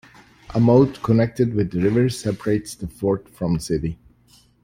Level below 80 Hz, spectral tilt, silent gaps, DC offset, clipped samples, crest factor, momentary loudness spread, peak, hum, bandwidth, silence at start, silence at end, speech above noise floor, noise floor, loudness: -44 dBFS; -7.5 dB/octave; none; under 0.1%; under 0.1%; 18 dB; 10 LU; -4 dBFS; none; 16 kHz; 0.5 s; 0.7 s; 36 dB; -55 dBFS; -21 LUFS